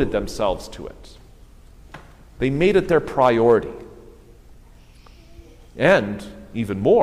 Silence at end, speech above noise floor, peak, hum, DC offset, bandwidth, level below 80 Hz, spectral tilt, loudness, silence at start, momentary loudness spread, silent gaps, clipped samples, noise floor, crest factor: 0 s; 27 dB; -4 dBFS; 60 Hz at -50 dBFS; under 0.1%; 14.5 kHz; -42 dBFS; -6.5 dB/octave; -19 LUFS; 0 s; 19 LU; none; under 0.1%; -46 dBFS; 18 dB